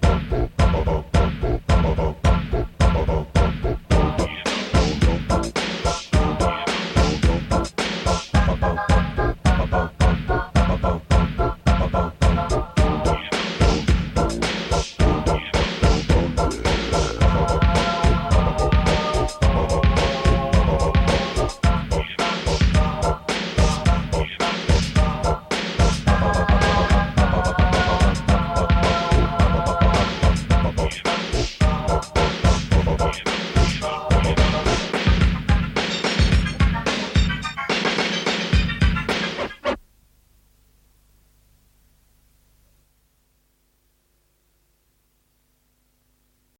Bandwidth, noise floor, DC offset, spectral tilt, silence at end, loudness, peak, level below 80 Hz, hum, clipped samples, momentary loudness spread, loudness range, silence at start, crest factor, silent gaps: 11.5 kHz; -65 dBFS; under 0.1%; -5.5 dB/octave; 6.8 s; -21 LUFS; -4 dBFS; -24 dBFS; 50 Hz at -45 dBFS; under 0.1%; 5 LU; 2 LU; 0 s; 16 dB; none